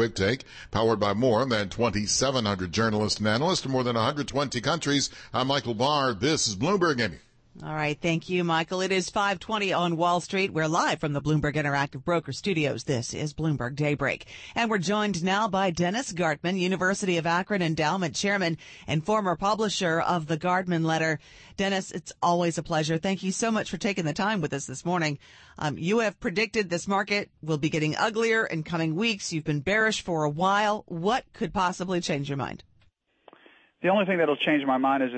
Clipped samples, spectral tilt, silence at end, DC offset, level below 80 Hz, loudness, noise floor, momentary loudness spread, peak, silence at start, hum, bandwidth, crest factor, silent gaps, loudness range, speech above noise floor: under 0.1%; -4.5 dB/octave; 0 s; under 0.1%; -54 dBFS; -26 LUFS; -65 dBFS; 6 LU; -12 dBFS; 0 s; none; 8.8 kHz; 14 dB; none; 3 LU; 38 dB